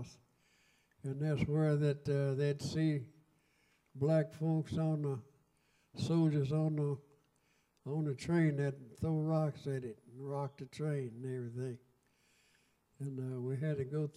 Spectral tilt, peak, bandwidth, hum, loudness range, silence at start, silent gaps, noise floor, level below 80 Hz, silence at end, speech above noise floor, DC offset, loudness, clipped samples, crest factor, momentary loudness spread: -8 dB/octave; -20 dBFS; 11 kHz; none; 7 LU; 0 s; none; -75 dBFS; -68 dBFS; 0.05 s; 40 dB; under 0.1%; -37 LUFS; under 0.1%; 18 dB; 13 LU